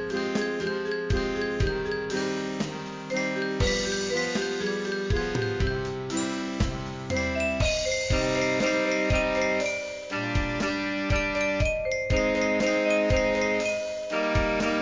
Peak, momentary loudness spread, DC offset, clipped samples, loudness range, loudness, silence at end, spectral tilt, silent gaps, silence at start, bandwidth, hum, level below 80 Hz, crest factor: -10 dBFS; 6 LU; under 0.1%; under 0.1%; 4 LU; -27 LUFS; 0 s; -4.5 dB/octave; none; 0 s; 7.6 kHz; none; -38 dBFS; 16 dB